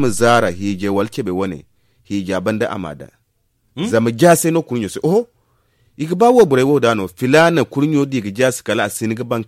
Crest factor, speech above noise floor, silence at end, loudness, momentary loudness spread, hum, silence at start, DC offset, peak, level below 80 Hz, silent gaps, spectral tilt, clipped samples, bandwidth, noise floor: 16 dB; 48 dB; 0.05 s; -16 LUFS; 14 LU; none; 0 s; under 0.1%; 0 dBFS; -54 dBFS; none; -5.5 dB/octave; under 0.1%; 16 kHz; -64 dBFS